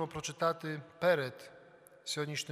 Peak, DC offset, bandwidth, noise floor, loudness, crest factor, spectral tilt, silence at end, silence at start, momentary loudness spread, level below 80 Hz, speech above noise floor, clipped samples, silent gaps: -16 dBFS; under 0.1%; 15.5 kHz; -59 dBFS; -35 LUFS; 20 dB; -4 dB/octave; 0 s; 0 s; 17 LU; -72 dBFS; 24 dB; under 0.1%; none